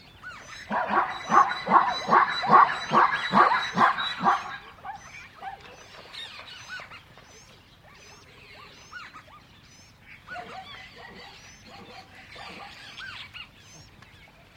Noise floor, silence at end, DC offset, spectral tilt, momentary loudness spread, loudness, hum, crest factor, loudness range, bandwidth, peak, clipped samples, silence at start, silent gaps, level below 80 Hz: -53 dBFS; 0.75 s; under 0.1%; -4 dB/octave; 25 LU; -22 LUFS; none; 24 dB; 23 LU; 13 kHz; -4 dBFS; under 0.1%; 0.25 s; none; -62 dBFS